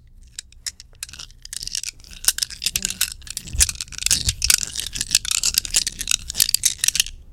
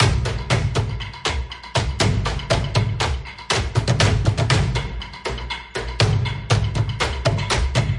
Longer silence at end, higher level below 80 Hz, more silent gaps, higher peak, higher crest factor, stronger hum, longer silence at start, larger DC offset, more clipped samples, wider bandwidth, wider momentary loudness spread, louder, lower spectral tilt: about the same, 0 s vs 0 s; second, -38 dBFS vs -30 dBFS; neither; about the same, 0 dBFS vs -2 dBFS; about the same, 24 dB vs 20 dB; neither; first, 0.2 s vs 0 s; neither; neither; first, over 20 kHz vs 11.5 kHz; first, 17 LU vs 10 LU; about the same, -20 LUFS vs -22 LUFS; second, 1 dB/octave vs -4.5 dB/octave